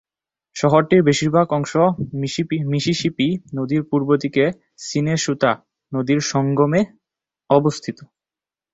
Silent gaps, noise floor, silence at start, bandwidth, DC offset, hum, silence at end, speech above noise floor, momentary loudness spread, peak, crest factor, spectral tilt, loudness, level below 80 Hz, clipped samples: none; -90 dBFS; 0.55 s; 8 kHz; under 0.1%; none; 0.7 s; 72 dB; 10 LU; -2 dBFS; 18 dB; -5.5 dB/octave; -19 LUFS; -56 dBFS; under 0.1%